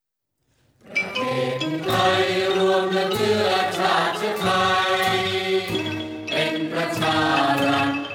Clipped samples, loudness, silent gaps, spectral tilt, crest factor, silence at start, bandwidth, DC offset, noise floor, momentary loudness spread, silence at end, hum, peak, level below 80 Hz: under 0.1%; -21 LUFS; none; -4.5 dB/octave; 16 dB; 0.85 s; 17.5 kHz; under 0.1%; -75 dBFS; 6 LU; 0 s; none; -6 dBFS; -58 dBFS